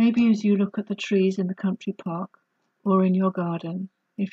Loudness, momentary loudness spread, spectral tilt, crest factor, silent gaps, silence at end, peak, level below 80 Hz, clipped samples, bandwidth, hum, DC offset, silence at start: -24 LUFS; 13 LU; -8 dB/octave; 16 dB; none; 0.05 s; -8 dBFS; -72 dBFS; under 0.1%; 7.4 kHz; none; under 0.1%; 0 s